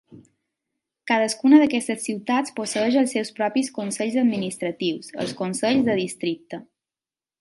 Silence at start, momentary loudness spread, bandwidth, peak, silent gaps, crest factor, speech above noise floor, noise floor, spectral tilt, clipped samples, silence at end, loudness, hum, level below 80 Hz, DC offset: 0.1 s; 13 LU; 11.5 kHz; -4 dBFS; none; 20 dB; over 68 dB; under -90 dBFS; -4.5 dB/octave; under 0.1%; 0.8 s; -22 LUFS; none; -68 dBFS; under 0.1%